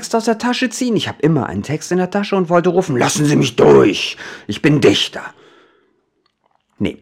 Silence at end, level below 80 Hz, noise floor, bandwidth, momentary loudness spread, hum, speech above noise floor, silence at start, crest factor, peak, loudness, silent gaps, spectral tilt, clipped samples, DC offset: 0.1 s; -50 dBFS; -64 dBFS; 16 kHz; 12 LU; none; 49 dB; 0 s; 16 dB; 0 dBFS; -15 LUFS; none; -5 dB/octave; under 0.1%; under 0.1%